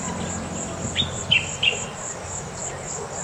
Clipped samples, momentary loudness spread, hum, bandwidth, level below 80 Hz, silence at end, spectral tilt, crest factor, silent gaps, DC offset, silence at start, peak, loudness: under 0.1%; 11 LU; none; 16 kHz; -48 dBFS; 0 s; -2 dB/octave; 20 dB; none; under 0.1%; 0 s; -6 dBFS; -24 LUFS